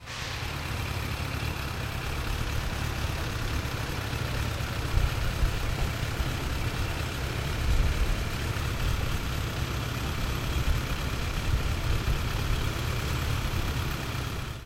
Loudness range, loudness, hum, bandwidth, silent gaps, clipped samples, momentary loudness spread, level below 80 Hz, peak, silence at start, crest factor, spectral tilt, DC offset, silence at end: 2 LU; -31 LUFS; none; 16 kHz; none; under 0.1%; 3 LU; -32 dBFS; -10 dBFS; 0 s; 18 dB; -4.5 dB/octave; under 0.1%; 0 s